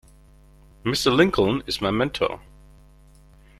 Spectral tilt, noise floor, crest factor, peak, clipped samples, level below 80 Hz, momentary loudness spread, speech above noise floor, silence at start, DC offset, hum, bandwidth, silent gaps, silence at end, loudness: -5 dB/octave; -51 dBFS; 22 dB; -2 dBFS; under 0.1%; -46 dBFS; 10 LU; 30 dB; 0.85 s; under 0.1%; none; 14.5 kHz; none; 1.2 s; -22 LUFS